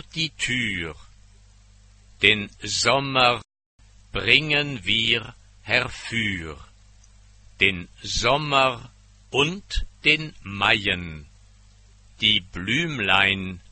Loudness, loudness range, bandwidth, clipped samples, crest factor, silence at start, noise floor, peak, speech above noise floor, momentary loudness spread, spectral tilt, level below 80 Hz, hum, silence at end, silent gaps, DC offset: -21 LUFS; 3 LU; 8.8 kHz; under 0.1%; 24 dB; 0.15 s; -52 dBFS; 0 dBFS; 29 dB; 14 LU; -3 dB/octave; -44 dBFS; 50 Hz at -55 dBFS; 0.1 s; 3.66-3.78 s; under 0.1%